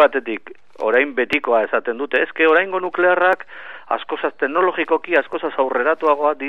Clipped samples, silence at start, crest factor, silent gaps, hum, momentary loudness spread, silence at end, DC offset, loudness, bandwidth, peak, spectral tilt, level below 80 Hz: under 0.1%; 0 s; 18 dB; none; none; 10 LU; 0 s; 0.8%; -18 LUFS; 6.4 kHz; 0 dBFS; -5.5 dB/octave; -64 dBFS